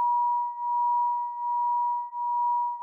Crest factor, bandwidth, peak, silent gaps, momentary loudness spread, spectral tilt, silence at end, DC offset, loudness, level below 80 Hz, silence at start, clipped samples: 6 dB; 2 kHz; -20 dBFS; none; 5 LU; 4.5 dB/octave; 0 s; under 0.1%; -27 LUFS; under -90 dBFS; 0 s; under 0.1%